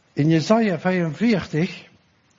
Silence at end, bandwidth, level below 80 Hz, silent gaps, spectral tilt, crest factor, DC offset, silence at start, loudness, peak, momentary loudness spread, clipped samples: 0.55 s; 7.6 kHz; -58 dBFS; none; -7 dB/octave; 18 dB; under 0.1%; 0.15 s; -21 LUFS; -2 dBFS; 8 LU; under 0.1%